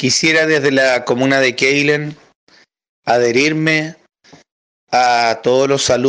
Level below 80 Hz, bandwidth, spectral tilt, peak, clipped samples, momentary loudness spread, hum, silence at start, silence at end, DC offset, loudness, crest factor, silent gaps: -54 dBFS; 10.5 kHz; -3.5 dB/octave; -2 dBFS; under 0.1%; 6 LU; none; 0 s; 0 s; under 0.1%; -14 LUFS; 12 dB; 2.35-2.47 s, 2.89-3.03 s, 4.52-4.87 s